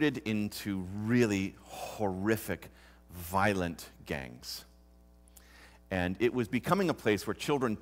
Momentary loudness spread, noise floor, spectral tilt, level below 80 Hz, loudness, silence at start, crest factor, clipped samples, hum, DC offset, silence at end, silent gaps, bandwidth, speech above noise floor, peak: 13 LU; -59 dBFS; -5.5 dB/octave; -58 dBFS; -33 LUFS; 0 s; 22 dB; under 0.1%; none; under 0.1%; 0 s; none; 16 kHz; 27 dB; -12 dBFS